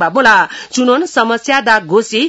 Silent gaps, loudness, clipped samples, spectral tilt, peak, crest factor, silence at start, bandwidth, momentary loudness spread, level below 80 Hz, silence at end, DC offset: none; -11 LUFS; 0.3%; -3 dB/octave; 0 dBFS; 12 dB; 0 s; 12 kHz; 5 LU; -52 dBFS; 0 s; under 0.1%